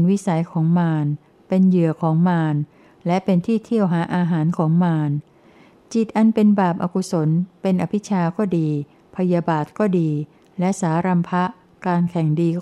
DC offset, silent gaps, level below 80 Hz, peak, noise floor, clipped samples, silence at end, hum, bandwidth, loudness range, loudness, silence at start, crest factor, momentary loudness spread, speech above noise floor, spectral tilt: under 0.1%; none; -64 dBFS; -6 dBFS; -50 dBFS; under 0.1%; 0 s; none; 11 kHz; 2 LU; -20 LUFS; 0 s; 14 dB; 9 LU; 31 dB; -8 dB/octave